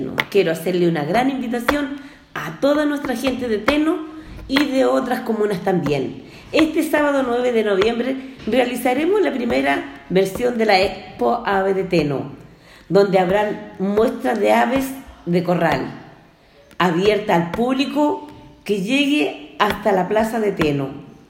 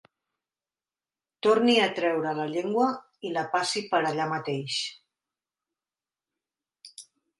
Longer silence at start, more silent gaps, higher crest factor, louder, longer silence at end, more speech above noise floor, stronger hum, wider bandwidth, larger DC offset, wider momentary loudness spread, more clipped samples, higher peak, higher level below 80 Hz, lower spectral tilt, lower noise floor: second, 0 s vs 1.45 s; neither; about the same, 20 dB vs 20 dB; first, -19 LUFS vs -26 LUFS; second, 0.2 s vs 0.4 s; second, 31 dB vs over 64 dB; neither; first, 16.5 kHz vs 11.5 kHz; neither; second, 10 LU vs 14 LU; neither; first, 0 dBFS vs -10 dBFS; first, -48 dBFS vs -78 dBFS; first, -5.5 dB/octave vs -4 dB/octave; second, -49 dBFS vs under -90 dBFS